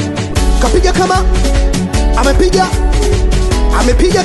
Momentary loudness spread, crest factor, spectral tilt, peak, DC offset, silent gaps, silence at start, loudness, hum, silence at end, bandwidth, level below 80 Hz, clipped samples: 3 LU; 10 dB; -5 dB/octave; 0 dBFS; under 0.1%; none; 0 s; -12 LUFS; none; 0 s; 12 kHz; -12 dBFS; under 0.1%